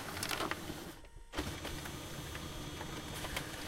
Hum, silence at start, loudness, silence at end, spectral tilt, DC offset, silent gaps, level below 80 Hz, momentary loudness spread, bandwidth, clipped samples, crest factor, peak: none; 0 s; -42 LUFS; 0 s; -3.5 dB/octave; under 0.1%; none; -52 dBFS; 8 LU; 16.5 kHz; under 0.1%; 24 dB; -20 dBFS